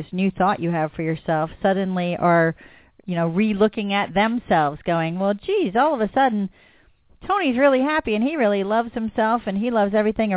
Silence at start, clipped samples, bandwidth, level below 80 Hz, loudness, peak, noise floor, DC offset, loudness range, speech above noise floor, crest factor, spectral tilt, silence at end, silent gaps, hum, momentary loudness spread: 0 s; under 0.1%; 4 kHz; -52 dBFS; -21 LUFS; -4 dBFS; -55 dBFS; under 0.1%; 2 LU; 34 dB; 16 dB; -10.5 dB/octave; 0 s; none; none; 7 LU